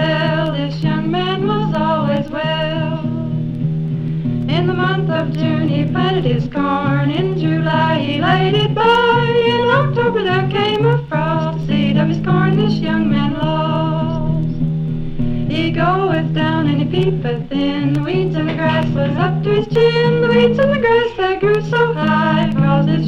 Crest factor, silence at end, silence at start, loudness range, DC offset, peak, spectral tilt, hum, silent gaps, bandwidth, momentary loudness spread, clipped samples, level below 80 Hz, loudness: 14 dB; 0 s; 0 s; 4 LU; under 0.1%; -2 dBFS; -8 dB/octave; none; none; 6.2 kHz; 6 LU; under 0.1%; -36 dBFS; -16 LUFS